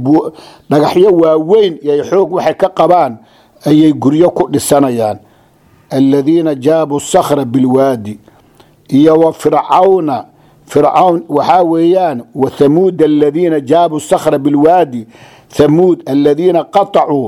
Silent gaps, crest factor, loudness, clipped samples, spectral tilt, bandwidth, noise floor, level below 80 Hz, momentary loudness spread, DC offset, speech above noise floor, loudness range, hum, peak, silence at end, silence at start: none; 10 dB; -10 LUFS; 0.2%; -6.5 dB/octave; 15.5 kHz; -46 dBFS; -50 dBFS; 8 LU; under 0.1%; 37 dB; 2 LU; none; 0 dBFS; 0 s; 0 s